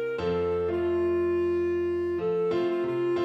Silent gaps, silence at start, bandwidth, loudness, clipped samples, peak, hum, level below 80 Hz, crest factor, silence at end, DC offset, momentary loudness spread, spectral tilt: none; 0 s; 5.8 kHz; -27 LUFS; under 0.1%; -18 dBFS; none; -54 dBFS; 8 dB; 0 s; under 0.1%; 2 LU; -8 dB/octave